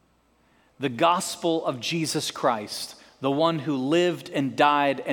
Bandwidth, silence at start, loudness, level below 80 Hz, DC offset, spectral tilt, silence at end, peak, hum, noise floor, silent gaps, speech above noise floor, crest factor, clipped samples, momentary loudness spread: 19 kHz; 0.8 s; -25 LUFS; -72 dBFS; under 0.1%; -4.5 dB/octave; 0 s; -6 dBFS; none; -64 dBFS; none; 39 dB; 20 dB; under 0.1%; 10 LU